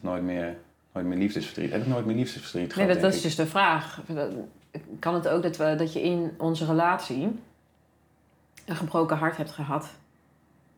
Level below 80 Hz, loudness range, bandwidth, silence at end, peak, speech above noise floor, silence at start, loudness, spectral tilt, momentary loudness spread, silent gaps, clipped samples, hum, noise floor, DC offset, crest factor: -64 dBFS; 5 LU; over 20 kHz; 0.85 s; -8 dBFS; 37 dB; 0 s; -27 LUFS; -6 dB/octave; 14 LU; none; under 0.1%; none; -64 dBFS; under 0.1%; 20 dB